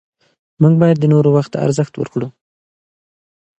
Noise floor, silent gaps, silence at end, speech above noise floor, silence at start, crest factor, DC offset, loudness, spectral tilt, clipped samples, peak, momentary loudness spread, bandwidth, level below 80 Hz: under -90 dBFS; none; 1.3 s; over 77 dB; 0.6 s; 16 dB; under 0.1%; -14 LUFS; -8.5 dB/octave; under 0.1%; 0 dBFS; 11 LU; 8.4 kHz; -58 dBFS